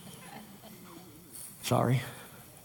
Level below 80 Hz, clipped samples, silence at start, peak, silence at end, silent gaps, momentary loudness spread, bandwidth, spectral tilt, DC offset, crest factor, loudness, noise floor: -66 dBFS; under 0.1%; 0 s; -14 dBFS; 0.05 s; none; 21 LU; 19 kHz; -5.5 dB/octave; under 0.1%; 22 dB; -32 LUFS; -51 dBFS